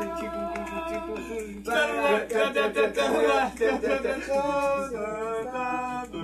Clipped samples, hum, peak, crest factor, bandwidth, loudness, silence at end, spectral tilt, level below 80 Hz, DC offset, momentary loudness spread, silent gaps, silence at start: under 0.1%; 60 Hz at -50 dBFS; -12 dBFS; 16 dB; 13 kHz; -27 LUFS; 0 s; -4 dB/octave; -52 dBFS; under 0.1%; 9 LU; none; 0 s